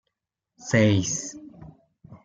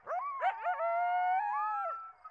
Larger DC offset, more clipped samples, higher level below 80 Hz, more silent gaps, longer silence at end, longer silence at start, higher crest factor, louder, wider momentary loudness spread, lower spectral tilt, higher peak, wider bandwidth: neither; neither; first, -62 dBFS vs -84 dBFS; neither; about the same, 0.1 s vs 0 s; first, 0.6 s vs 0.05 s; first, 20 dB vs 12 dB; first, -23 LUFS vs -33 LUFS; first, 23 LU vs 7 LU; first, -5 dB/octave vs -2 dB/octave; first, -8 dBFS vs -22 dBFS; first, 9.2 kHz vs 5 kHz